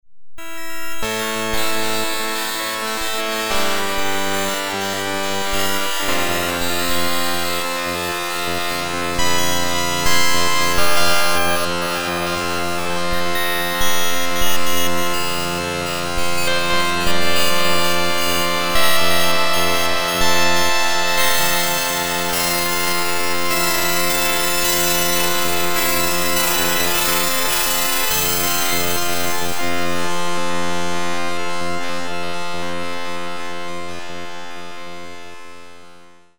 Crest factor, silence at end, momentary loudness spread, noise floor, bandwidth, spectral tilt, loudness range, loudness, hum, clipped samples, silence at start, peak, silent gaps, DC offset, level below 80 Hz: 14 dB; 0 s; 10 LU; -46 dBFS; over 20 kHz; -2 dB/octave; 8 LU; -19 LUFS; none; under 0.1%; 0 s; -2 dBFS; none; under 0.1%; -40 dBFS